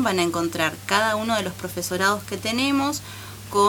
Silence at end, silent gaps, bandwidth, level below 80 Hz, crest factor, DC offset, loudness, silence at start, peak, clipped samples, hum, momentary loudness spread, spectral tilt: 0 s; none; over 20 kHz; -54 dBFS; 20 dB; under 0.1%; -23 LUFS; 0 s; -4 dBFS; under 0.1%; none; 8 LU; -3.5 dB/octave